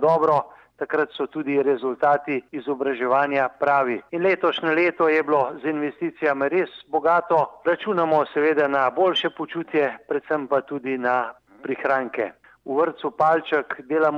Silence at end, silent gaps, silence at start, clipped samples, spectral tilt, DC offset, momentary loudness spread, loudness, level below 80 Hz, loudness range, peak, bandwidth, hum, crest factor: 0 s; none; 0 s; under 0.1%; -6.5 dB/octave; under 0.1%; 8 LU; -22 LUFS; -72 dBFS; 3 LU; -6 dBFS; 6.8 kHz; none; 16 dB